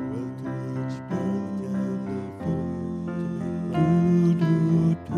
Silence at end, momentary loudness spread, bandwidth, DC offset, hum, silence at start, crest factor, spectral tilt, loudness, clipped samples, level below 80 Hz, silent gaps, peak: 0 s; 11 LU; 7 kHz; under 0.1%; none; 0 s; 14 dB; -9.5 dB/octave; -26 LUFS; under 0.1%; -54 dBFS; none; -10 dBFS